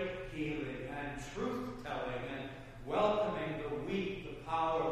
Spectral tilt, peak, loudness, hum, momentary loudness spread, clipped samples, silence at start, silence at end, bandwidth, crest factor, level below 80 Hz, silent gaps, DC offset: -6 dB/octave; -20 dBFS; -38 LUFS; none; 10 LU; under 0.1%; 0 s; 0 s; 14.5 kHz; 18 dB; -54 dBFS; none; under 0.1%